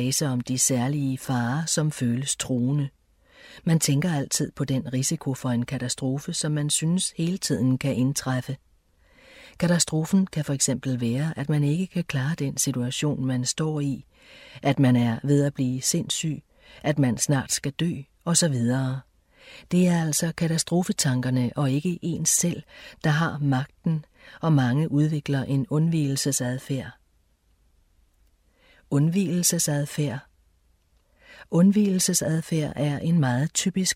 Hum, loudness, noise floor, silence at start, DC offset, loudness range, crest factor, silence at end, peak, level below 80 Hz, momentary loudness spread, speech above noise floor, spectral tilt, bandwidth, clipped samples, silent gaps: none; -24 LUFS; -64 dBFS; 0 s; under 0.1%; 3 LU; 18 dB; 0 s; -6 dBFS; -58 dBFS; 7 LU; 40 dB; -4.5 dB/octave; 16 kHz; under 0.1%; none